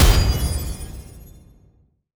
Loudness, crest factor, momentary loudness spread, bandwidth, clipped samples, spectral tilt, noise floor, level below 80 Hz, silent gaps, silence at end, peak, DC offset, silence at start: -22 LUFS; 18 dB; 25 LU; over 20 kHz; under 0.1%; -4.5 dB/octave; -58 dBFS; -22 dBFS; none; 1 s; -2 dBFS; under 0.1%; 0 s